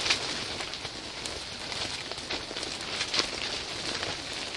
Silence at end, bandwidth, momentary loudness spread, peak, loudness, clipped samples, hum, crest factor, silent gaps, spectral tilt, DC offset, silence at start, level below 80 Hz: 0 s; 11.5 kHz; 8 LU; -4 dBFS; -32 LUFS; under 0.1%; none; 28 dB; none; -1.5 dB/octave; under 0.1%; 0 s; -56 dBFS